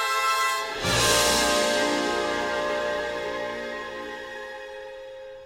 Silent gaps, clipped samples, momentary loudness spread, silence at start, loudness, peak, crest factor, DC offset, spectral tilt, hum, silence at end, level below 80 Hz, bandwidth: none; under 0.1%; 18 LU; 0 s; -24 LUFS; -8 dBFS; 18 dB; under 0.1%; -2 dB/octave; none; 0 s; -48 dBFS; 17 kHz